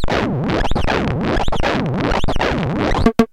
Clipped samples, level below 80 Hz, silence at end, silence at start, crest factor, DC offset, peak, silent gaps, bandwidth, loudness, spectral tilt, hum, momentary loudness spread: under 0.1%; -24 dBFS; 0.05 s; 0 s; 16 dB; under 0.1%; 0 dBFS; none; 10.5 kHz; -19 LUFS; -6.5 dB/octave; none; 3 LU